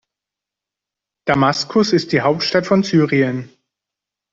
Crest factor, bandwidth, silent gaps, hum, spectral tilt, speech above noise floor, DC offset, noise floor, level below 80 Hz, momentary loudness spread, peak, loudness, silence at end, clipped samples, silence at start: 16 dB; 8 kHz; none; none; -5.5 dB/octave; 70 dB; under 0.1%; -86 dBFS; -56 dBFS; 6 LU; -2 dBFS; -16 LUFS; 0.85 s; under 0.1%; 1.25 s